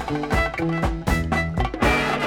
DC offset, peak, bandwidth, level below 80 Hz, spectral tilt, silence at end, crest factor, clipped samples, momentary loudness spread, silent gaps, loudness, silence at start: under 0.1%; -6 dBFS; 17.5 kHz; -30 dBFS; -6 dB/octave; 0 s; 16 dB; under 0.1%; 4 LU; none; -22 LUFS; 0 s